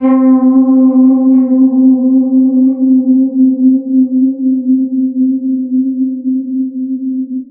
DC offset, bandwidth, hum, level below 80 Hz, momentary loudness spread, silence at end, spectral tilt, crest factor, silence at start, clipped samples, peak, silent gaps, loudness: under 0.1%; 2.2 kHz; none; -68 dBFS; 9 LU; 0.05 s; -10 dB/octave; 10 dB; 0 s; under 0.1%; 0 dBFS; none; -10 LUFS